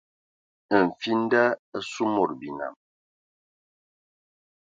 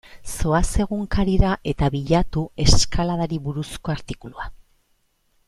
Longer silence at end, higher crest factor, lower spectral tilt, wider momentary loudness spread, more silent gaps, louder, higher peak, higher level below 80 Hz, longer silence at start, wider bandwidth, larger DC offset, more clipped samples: first, 1.95 s vs 0.9 s; about the same, 22 dB vs 20 dB; about the same, -5.5 dB/octave vs -5 dB/octave; about the same, 13 LU vs 15 LU; first, 1.59-1.72 s vs none; second, -25 LUFS vs -22 LUFS; second, -6 dBFS vs -2 dBFS; second, -70 dBFS vs -28 dBFS; first, 0.7 s vs 0.15 s; second, 7.8 kHz vs 13 kHz; neither; neither